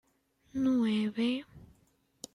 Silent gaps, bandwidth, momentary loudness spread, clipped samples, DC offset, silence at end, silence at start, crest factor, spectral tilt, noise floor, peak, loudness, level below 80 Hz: none; 11.5 kHz; 13 LU; under 0.1%; under 0.1%; 0.7 s; 0.55 s; 14 dB; -5.5 dB/octave; -71 dBFS; -20 dBFS; -31 LUFS; -66 dBFS